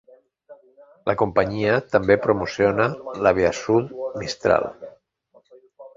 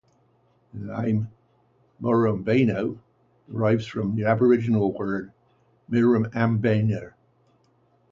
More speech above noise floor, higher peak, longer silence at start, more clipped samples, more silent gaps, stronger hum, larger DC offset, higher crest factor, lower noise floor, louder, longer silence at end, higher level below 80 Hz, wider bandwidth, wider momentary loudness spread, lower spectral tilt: about the same, 38 dB vs 41 dB; first, -2 dBFS vs -6 dBFS; second, 0.5 s vs 0.75 s; neither; neither; neither; neither; about the same, 20 dB vs 20 dB; second, -58 dBFS vs -63 dBFS; first, -21 LUFS vs -24 LUFS; second, 0.1 s vs 1.05 s; first, -50 dBFS vs -58 dBFS; about the same, 7.6 kHz vs 7.4 kHz; second, 11 LU vs 16 LU; second, -6 dB/octave vs -9 dB/octave